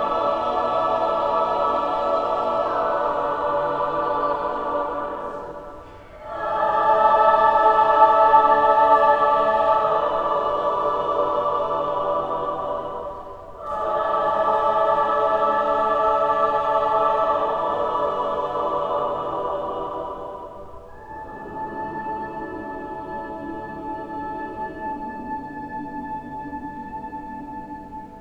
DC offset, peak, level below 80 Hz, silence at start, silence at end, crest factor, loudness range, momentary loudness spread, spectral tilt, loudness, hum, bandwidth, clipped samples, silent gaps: under 0.1%; -2 dBFS; -50 dBFS; 0 s; 0 s; 20 dB; 15 LU; 18 LU; -6 dB/octave; -21 LUFS; none; 8 kHz; under 0.1%; none